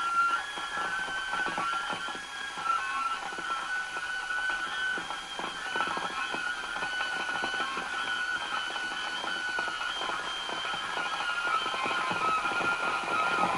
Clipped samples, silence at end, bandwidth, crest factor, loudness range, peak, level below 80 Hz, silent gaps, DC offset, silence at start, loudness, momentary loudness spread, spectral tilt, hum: under 0.1%; 0 s; 11.5 kHz; 18 dB; 2 LU; -14 dBFS; -64 dBFS; none; under 0.1%; 0 s; -31 LUFS; 5 LU; -1.5 dB/octave; none